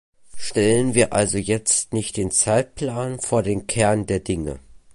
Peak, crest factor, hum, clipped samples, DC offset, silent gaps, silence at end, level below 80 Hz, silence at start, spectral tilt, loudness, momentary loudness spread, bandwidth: -2 dBFS; 20 dB; none; under 0.1%; under 0.1%; none; 0.05 s; -44 dBFS; 0.25 s; -4 dB/octave; -21 LUFS; 9 LU; 11.5 kHz